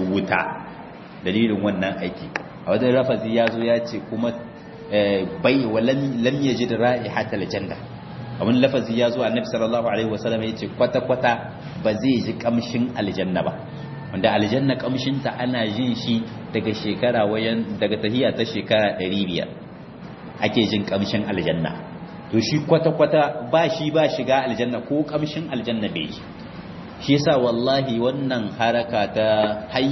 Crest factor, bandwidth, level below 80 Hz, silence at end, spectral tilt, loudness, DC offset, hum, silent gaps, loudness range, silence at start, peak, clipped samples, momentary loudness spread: 20 dB; 6.2 kHz; -54 dBFS; 0 s; -6.5 dB/octave; -22 LUFS; under 0.1%; none; none; 3 LU; 0 s; -2 dBFS; under 0.1%; 14 LU